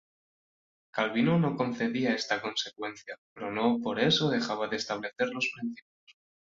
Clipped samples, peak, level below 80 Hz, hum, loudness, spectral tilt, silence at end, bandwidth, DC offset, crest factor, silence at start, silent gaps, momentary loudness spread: under 0.1%; -12 dBFS; -70 dBFS; none; -30 LUFS; -5 dB/octave; 0.45 s; 7.6 kHz; under 0.1%; 18 dB; 0.95 s; 3.18-3.36 s, 5.82-6.07 s; 13 LU